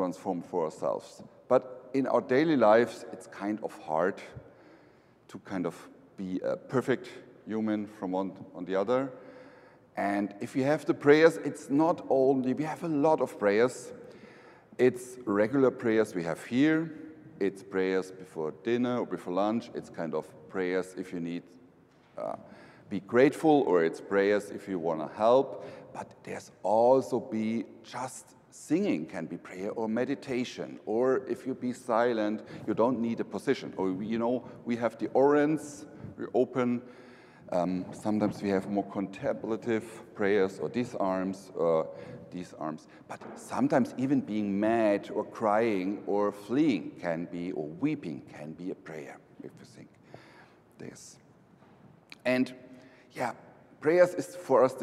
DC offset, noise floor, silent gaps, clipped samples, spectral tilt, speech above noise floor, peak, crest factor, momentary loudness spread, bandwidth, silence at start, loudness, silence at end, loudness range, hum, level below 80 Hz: under 0.1%; -60 dBFS; none; under 0.1%; -6.5 dB/octave; 31 dB; -8 dBFS; 22 dB; 19 LU; 14 kHz; 0 s; -30 LUFS; 0 s; 9 LU; none; -74 dBFS